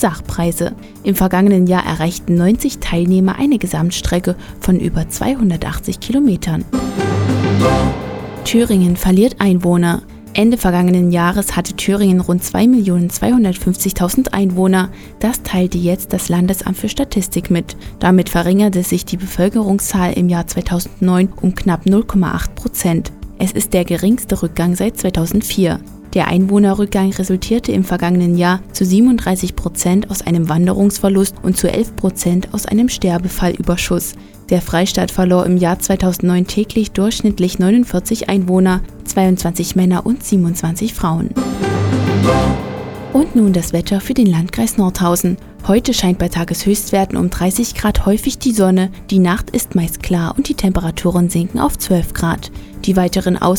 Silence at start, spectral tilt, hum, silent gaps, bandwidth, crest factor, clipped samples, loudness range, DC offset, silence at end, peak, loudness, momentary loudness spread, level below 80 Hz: 0 s; -6 dB/octave; none; none; 19 kHz; 14 dB; under 0.1%; 3 LU; under 0.1%; 0 s; 0 dBFS; -15 LUFS; 6 LU; -30 dBFS